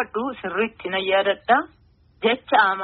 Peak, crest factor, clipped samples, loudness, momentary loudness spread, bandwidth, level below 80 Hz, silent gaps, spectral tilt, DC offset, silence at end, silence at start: -4 dBFS; 18 dB; under 0.1%; -22 LUFS; 8 LU; 4.9 kHz; -60 dBFS; none; -0.5 dB/octave; under 0.1%; 0 s; 0 s